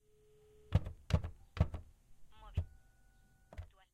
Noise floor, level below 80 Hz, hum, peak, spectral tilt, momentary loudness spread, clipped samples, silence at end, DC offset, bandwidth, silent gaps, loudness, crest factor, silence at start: -67 dBFS; -48 dBFS; none; -18 dBFS; -7.5 dB/octave; 17 LU; under 0.1%; 0.25 s; under 0.1%; 9.8 kHz; none; -40 LUFS; 24 dB; 0.7 s